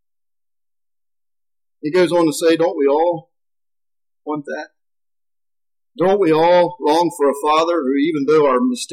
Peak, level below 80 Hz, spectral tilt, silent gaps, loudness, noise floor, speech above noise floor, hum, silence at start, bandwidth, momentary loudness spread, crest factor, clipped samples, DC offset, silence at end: -6 dBFS; -64 dBFS; -5 dB/octave; none; -16 LUFS; under -90 dBFS; over 74 dB; none; 1.85 s; 15 kHz; 13 LU; 12 dB; under 0.1%; under 0.1%; 0 s